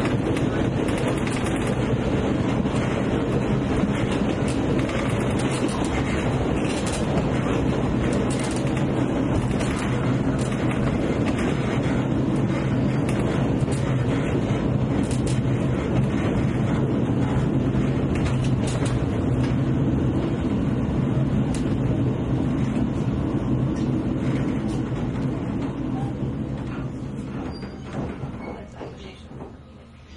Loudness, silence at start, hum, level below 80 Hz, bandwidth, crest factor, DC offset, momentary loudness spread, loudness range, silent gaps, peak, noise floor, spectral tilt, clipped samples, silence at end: -24 LUFS; 0 s; none; -36 dBFS; 11.5 kHz; 14 dB; under 0.1%; 7 LU; 5 LU; none; -8 dBFS; -44 dBFS; -7 dB/octave; under 0.1%; 0 s